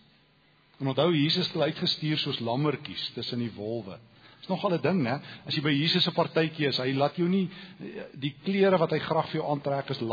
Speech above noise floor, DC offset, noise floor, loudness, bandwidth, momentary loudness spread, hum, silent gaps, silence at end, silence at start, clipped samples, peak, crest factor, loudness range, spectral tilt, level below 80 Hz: 35 dB; under 0.1%; -63 dBFS; -28 LUFS; 5 kHz; 11 LU; none; none; 0 s; 0.8 s; under 0.1%; -10 dBFS; 18 dB; 4 LU; -7 dB/octave; -70 dBFS